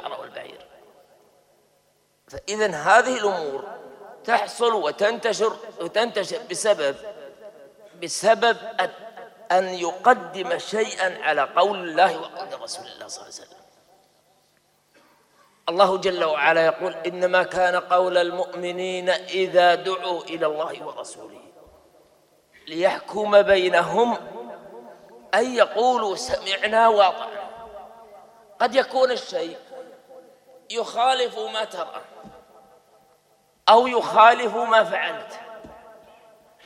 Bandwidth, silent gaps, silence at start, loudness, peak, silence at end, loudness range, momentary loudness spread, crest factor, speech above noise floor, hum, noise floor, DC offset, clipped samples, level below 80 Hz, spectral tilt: 13.5 kHz; none; 0 s; -21 LUFS; 0 dBFS; 0.85 s; 8 LU; 21 LU; 22 dB; 43 dB; none; -64 dBFS; under 0.1%; under 0.1%; -64 dBFS; -3 dB/octave